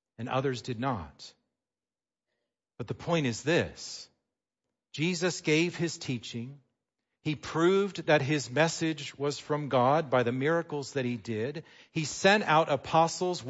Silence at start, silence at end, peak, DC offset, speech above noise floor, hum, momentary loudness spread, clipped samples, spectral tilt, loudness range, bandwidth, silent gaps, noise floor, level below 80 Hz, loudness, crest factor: 0.2 s; 0 s; -10 dBFS; under 0.1%; over 61 dB; none; 15 LU; under 0.1%; -5 dB/octave; 7 LU; 8 kHz; none; under -90 dBFS; -66 dBFS; -29 LUFS; 20 dB